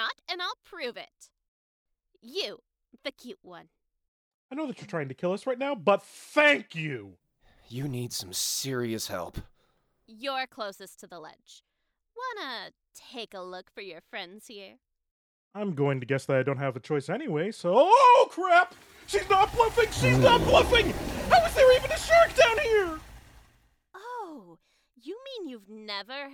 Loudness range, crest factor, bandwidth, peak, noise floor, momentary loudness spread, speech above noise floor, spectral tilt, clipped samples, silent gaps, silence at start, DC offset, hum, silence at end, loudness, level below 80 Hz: 19 LU; 20 dB; 20 kHz; -6 dBFS; -71 dBFS; 23 LU; 44 dB; -4 dB/octave; under 0.1%; 1.48-1.86 s, 4.08-4.49 s, 15.11-15.51 s; 0 s; under 0.1%; none; 0 s; -25 LUFS; -48 dBFS